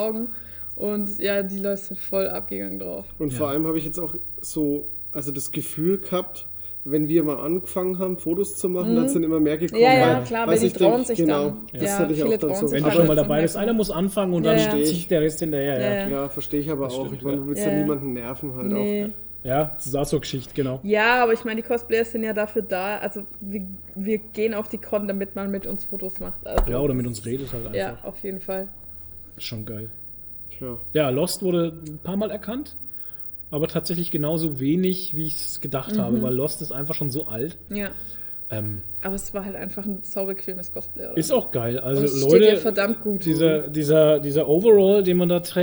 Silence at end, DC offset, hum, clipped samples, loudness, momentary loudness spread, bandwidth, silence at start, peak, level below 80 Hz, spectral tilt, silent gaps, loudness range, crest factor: 0 s; under 0.1%; none; under 0.1%; -23 LUFS; 11 LU; over 20 kHz; 0 s; -2 dBFS; -44 dBFS; -5.5 dB/octave; none; 7 LU; 20 dB